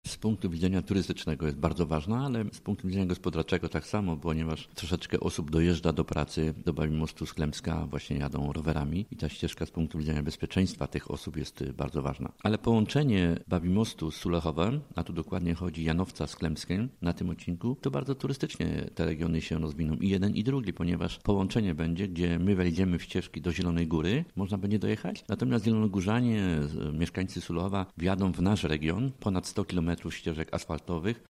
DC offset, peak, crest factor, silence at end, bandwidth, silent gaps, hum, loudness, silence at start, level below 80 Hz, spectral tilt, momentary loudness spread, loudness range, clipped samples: under 0.1%; -10 dBFS; 20 dB; 0.15 s; 14.5 kHz; none; none; -31 LUFS; 0.05 s; -46 dBFS; -7 dB/octave; 7 LU; 3 LU; under 0.1%